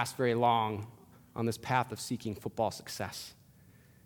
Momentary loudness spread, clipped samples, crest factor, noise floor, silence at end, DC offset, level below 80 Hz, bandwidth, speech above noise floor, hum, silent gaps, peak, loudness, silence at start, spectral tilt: 16 LU; under 0.1%; 22 dB; -60 dBFS; 0.7 s; under 0.1%; -68 dBFS; 19 kHz; 27 dB; none; none; -12 dBFS; -33 LUFS; 0 s; -5 dB/octave